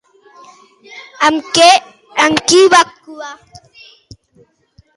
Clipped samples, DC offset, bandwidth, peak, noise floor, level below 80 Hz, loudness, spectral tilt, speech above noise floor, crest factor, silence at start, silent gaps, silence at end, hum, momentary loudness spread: under 0.1%; under 0.1%; 11.5 kHz; 0 dBFS; -52 dBFS; -54 dBFS; -10 LUFS; -1.5 dB/octave; 41 dB; 14 dB; 0.95 s; none; 1.6 s; none; 22 LU